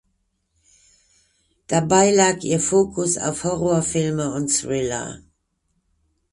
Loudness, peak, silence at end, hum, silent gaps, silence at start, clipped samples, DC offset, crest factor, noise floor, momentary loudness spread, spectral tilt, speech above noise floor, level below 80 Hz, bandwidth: -20 LUFS; -2 dBFS; 1.15 s; none; none; 1.7 s; under 0.1%; under 0.1%; 20 dB; -71 dBFS; 8 LU; -4 dB/octave; 51 dB; -52 dBFS; 11.5 kHz